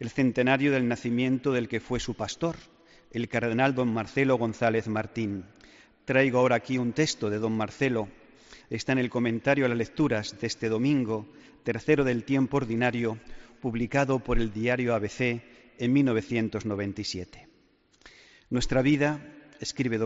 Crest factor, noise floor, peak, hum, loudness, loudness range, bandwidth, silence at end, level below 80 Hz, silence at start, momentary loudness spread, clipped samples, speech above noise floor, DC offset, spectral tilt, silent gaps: 18 dB; -64 dBFS; -8 dBFS; none; -27 LUFS; 3 LU; 8 kHz; 0 s; -46 dBFS; 0 s; 10 LU; under 0.1%; 37 dB; under 0.1%; -5.5 dB/octave; none